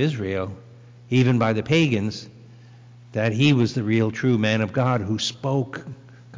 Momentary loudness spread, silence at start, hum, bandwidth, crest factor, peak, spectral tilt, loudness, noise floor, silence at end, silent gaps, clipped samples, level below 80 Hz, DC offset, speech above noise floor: 13 LU; 0 s; 60 Hz at -45 dBFS; 7.6 kHz; 14 dB; -8 dBFS; -6.5 dB/octave; -22 LUFS; -46 dBFS; 0 s; none; under 0.1%; -52 dBFS; under 0.1%; 25 dB